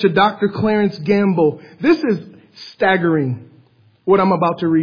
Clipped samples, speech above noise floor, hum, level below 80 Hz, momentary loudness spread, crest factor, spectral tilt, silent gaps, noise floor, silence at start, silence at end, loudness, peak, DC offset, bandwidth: under 0.1%; 36 dB; none; -56 dBFS; 10 LU; 16 dB; -8.5 dB/octave; none; -52 dBFS; 0 s; 0 s; -17 LUFS; -2 dBFS; under 0.1%; 5.2 kHz